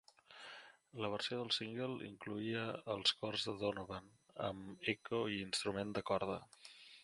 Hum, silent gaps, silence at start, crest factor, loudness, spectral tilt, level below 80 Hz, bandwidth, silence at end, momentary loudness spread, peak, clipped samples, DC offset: none; none; 0.3 s; 22 dB; -41 LUFS; -4 dB/octave; -72 dBFS; 11.5 kHz; 0 s; 19 LU; -20 dBFS; under 0.1%; under 0.1%